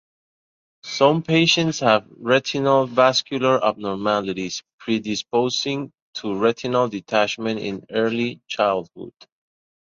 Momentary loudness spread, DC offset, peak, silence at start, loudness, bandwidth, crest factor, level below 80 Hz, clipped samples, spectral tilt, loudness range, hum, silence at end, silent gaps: 12 LU; under 0.1%; -2 dBFS; 0.85 s; -21 LUFS; 7.6 kHz; 20 dB; -62 dBFS; under 0.1%; -4.5 dB/octave; 5 LU; none; 0.9 s; 4.73-4.78 s, 6.02-6.13 s